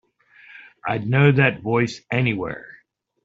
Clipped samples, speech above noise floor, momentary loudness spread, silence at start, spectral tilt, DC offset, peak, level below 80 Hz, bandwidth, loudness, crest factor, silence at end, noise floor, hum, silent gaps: under 0.1%; 31 dB; 15 LU; 0.55 s; -6 dB/octave; under 0.1%; -4 dBFS; -56 dBFS; 7.6 kHz; -20 LUFS; 18 dB; 0.55 s; -51 dBFS; none; none